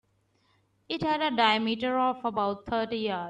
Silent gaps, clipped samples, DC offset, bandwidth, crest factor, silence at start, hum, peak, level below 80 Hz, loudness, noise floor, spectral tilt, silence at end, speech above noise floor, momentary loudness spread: none; under 0.1%; under 0.1%; 9.6 kHz; 20 dB; 0.9 s; none; -8 dBFS; -62 dBFS; -28 LUFS; -70 dBFS; -5.5 dB/octave; 0 s; 42 dB; 7 LU